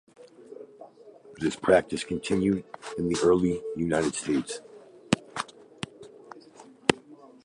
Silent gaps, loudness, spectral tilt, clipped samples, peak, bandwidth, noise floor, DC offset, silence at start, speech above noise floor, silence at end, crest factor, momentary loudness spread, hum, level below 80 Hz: none; -27 LUFS; -5 dB/octave; under 0.1%; -2 dBFS; 11.5 kHz; -51 dBFS; under 0.1%; 0.2 s; 25 dB; 0.3 s; 28 dB; 24 LU; none; -56 dBFS